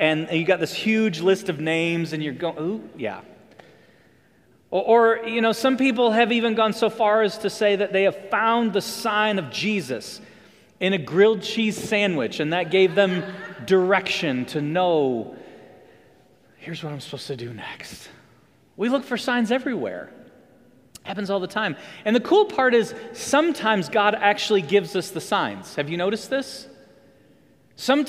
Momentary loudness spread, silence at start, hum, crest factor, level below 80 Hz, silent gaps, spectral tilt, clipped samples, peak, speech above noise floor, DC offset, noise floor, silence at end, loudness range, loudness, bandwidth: 14 LU; 0 s; none; 20 dB; -68 dBFS; none; -5 dB/octave; under 0.1%; -2 dBFS; 36 dB; under 0.1%; -58 dBFS; 0 s; 8 LU; -22 LUFS; 16 kHz